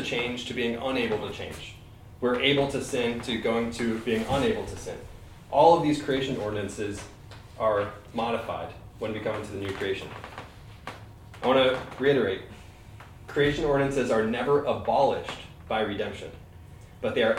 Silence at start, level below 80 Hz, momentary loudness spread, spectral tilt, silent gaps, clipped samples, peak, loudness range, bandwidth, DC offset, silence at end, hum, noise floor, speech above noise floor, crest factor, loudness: 0 s; -50 dBFS; 20 LU; -5 dB/octave; none; under 0.1%; -6 dBFS; 5 LU; 16 kHz; under 0.1%; 0 s; none; -47 dBFS; 20 dB; 22 dB; -27 LUFS